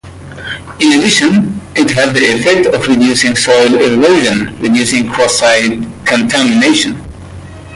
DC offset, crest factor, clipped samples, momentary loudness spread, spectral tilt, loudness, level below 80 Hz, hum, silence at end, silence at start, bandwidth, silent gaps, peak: under 0.1%; 10 dB; under 0.1%; 15 LU; -3.5 dB/octave; -9 LUFS; -40 dBFS; none; 0 s; 0.05 s; 11.5 kHz; none; 0 dBFS